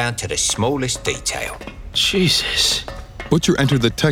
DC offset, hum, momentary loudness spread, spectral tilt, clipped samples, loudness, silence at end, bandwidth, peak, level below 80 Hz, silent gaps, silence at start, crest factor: under 0.1%; none; 11 LU; -3.5 dB/octave; under 0.1%; -18 LUFS; 0 s; 18 kHz; -2 dBFS; -36 dBFS; none; 0 s; 18 dB